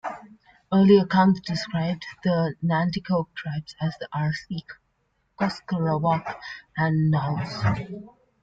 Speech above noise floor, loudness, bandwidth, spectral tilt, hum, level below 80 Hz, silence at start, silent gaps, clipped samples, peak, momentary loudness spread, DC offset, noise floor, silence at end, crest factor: 47 dB; -24 LUFS; 7.6 kHz; -7.5 dB/octave; none; -56 dBFS; 0.05 s; none; under 0.1%; -6 dBFS; 16 LU; under 0.1%; -71 dBFS; 0.35 s; 18 dB